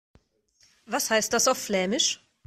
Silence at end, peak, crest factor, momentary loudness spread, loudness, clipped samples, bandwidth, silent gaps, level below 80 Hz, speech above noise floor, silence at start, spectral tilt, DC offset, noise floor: 0.3 s; -10 dBFS; 18 dB; 6 LU; -24 LUFS; under 0.1%; 16 kHz; none; -64 dBFS; 39 dB; 0.9 s; -1.5 dB/octave; under 0.1%; -65 dBFS